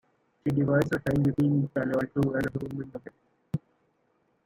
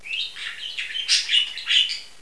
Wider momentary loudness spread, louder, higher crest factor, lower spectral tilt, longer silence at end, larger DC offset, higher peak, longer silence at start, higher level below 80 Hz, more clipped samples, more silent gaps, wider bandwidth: about the same, 12 LU vs 12 LU; second, -28 LUFS vs -21 LUFS; about the same, 18 dB vs 20 dB; first, -8.5 dB/octave vs 4 dB/octave; first, 0.9 s vs 0.1 s; second, under 0.1% vs 0.6%; second, -12 dBFS vs -4 dBFS; first, 0.45 s vs 0 s; first, -54 dBFS vs -66 dBFS; neither; neither; first, 15.5 kHz vs 11 kHz